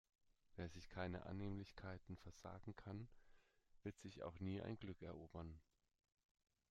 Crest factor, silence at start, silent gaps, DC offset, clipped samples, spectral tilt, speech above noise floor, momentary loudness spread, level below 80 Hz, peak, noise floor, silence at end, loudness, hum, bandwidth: 20 dB; 0.5 s; none; under 0.1%; under 0.1%; -7 dB/octave; 20 dB; 9 LU; -70 dBFS; -34 dBFS; -73 dBFS; 1.1 s; -54 LUFS; none; 9.4 kHz